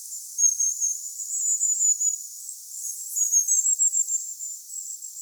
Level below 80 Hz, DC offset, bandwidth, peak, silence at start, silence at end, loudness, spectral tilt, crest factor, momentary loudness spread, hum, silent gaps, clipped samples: under -90 dBFS; under 0.1%; over 20 kHz; -10 dBFS; 0 s; 0 s; -22 LUFS; 11.5 dB/octave; 16 dB; 15 LU; none; none; under 0.1%